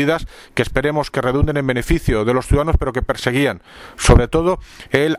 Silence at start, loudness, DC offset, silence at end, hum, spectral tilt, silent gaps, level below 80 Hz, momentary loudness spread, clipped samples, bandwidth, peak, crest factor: 0 s; -18 LUFS; under 0.1%; 0 s; none; -5.5 dB/octave; none; -24 dBFS; 9 LU; under 0.1%; 16 kHz; 0 dBFS; 16 dB